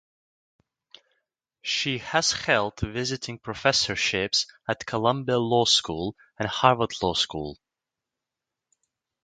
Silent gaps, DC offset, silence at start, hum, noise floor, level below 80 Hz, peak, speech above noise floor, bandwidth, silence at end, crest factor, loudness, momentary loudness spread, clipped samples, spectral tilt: none; under 0.1%; 1.65 s; none; -88 dBFS; -52 dBFS; -2 dBFS; 62 dB; 9.6 kHz; 1.7 s; 26 dB; -24 LUFS; 11 LU; under 0.1%; -3 dB/octave